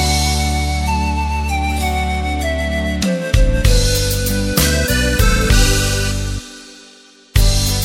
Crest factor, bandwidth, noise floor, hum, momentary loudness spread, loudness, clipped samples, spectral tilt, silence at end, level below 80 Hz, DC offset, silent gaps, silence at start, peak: 16 dB; 17 kHz; -44 dBFS; none; 6 LU; -16 LUFS; under 0.1%; -4 dB/octave; 0 s; -18 dBFS; under 0.1%; none; 0 s; 0 dBFS